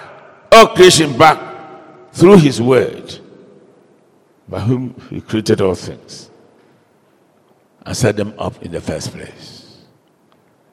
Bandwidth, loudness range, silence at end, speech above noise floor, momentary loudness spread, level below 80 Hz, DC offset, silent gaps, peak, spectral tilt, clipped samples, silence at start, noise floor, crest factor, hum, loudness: 19.5 kHz; 13 LU; 1.45 s; 41 dB; 26 LU; -46 dBFS; under 0.1%; none; 0 dBFS; -5 dB/octave; 1%; 0.5 s; -54 dBFS; 16 dB; none; -12 LUFS